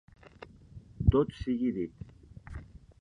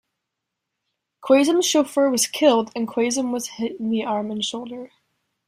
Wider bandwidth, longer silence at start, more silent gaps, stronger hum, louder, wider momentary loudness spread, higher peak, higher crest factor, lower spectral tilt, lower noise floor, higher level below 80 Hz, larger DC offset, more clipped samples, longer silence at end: second, 6.4 kHz vs 16 kHz; second, 0.4 s vs 1.2 s; neither; neither; second, -30 LUFS vs -21 LUFS; first, 26 LU vs 12 LU; second, -10 dBFS vs -4 dBFS; first, 24 dB vs 18 dB; first, -9.5 dB/octave vs -3 dB/octave; second, -52 dBFS vs -82 dBFS; first, -40 dBFS vs -68 dBFS; neither; neither; second, 0.25 s vs 0.6 s